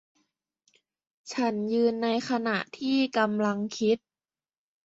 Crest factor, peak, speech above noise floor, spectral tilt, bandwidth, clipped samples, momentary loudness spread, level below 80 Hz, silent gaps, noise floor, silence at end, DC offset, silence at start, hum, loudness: 20 dB; -10 dBFS; over 63 dB; -5 dB/octave; 8 kHz; under 0.1%; 5 LU; -74 dBFS; none; under -90 dBFS; 0.9 s; under 0.1%; 1.25 s; none; -27 LUFS